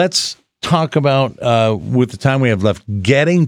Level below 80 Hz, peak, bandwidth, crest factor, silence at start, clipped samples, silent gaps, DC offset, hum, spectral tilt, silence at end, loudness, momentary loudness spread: -50 dBFS; 0 dBFS; 14.5 kHz; 14 dB; 0 s; under 0.1%; none; under 0.1%; none; -5.5 dB/octave; 0 s; -15 LUFS; 4 LU